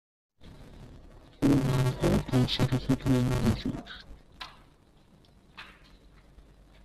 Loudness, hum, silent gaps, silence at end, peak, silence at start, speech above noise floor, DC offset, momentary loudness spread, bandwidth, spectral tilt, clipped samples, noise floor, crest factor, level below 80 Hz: -28 LUFS; none; none; 1.15 s; -12 dBFS; 0.4 s; 32 dB; under 0.1%; 24 LU; 14 kHz; -6.5 dB/octave; under 0.1%; -59 dBFS; 18 dB; -44 dBFS